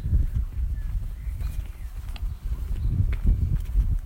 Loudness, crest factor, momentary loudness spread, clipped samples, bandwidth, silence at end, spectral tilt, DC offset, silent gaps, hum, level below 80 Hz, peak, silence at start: -30 LUFS; 16 dB; 10 LU; under 0.1%; 16 kHz; 0 s; -8 dB/octave; under 0.1%; none; none; -26 dBFS; -10 dBFS; 0 s